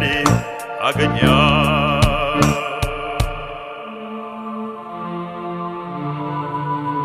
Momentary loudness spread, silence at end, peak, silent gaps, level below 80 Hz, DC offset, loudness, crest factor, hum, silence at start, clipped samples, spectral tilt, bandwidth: 15 LU; 0 s; 0 dBFS; none; -32 dBFS; under 0.1%; -19 LUFS; 20 dB; none; 0 s; under 0.1%; -5.5 dB/octave; 14 kHz